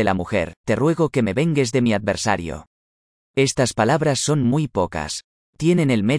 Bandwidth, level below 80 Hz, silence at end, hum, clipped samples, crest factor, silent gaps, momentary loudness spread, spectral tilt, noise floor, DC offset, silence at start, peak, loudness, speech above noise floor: 10.5 kHz; -46 dBFS; 0 s; none; under 0.1%; 16 dB; 0.57-0.64 s, 2.67-3.34 s, 5.24-5.53 s; 9 LU; -5.5 dB/octave; under -90 dBFS; under 0.1%; 0 s; -4 dBFS; -20 LUFS; over 71 dB